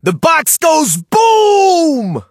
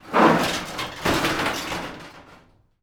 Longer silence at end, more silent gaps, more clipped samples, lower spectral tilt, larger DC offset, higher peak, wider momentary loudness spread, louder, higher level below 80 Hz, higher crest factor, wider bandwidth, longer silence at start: second, 0.1 s vs 0.45 s; neither; neither; about the same, -3.5 dB/octave vs -4 dB/octave; neither; about the same, 0 dBFS vs -2 dBFS; second, 4 LU vs 18 LU; first, -10 LUFS vs -22 LUFS; second, -56 dBFS vs -46 dBFS; second, 10 dB vs 20 dB; second, 17 kHz vs over 20 kHz; about the same, 0.05 s vs 0.05 s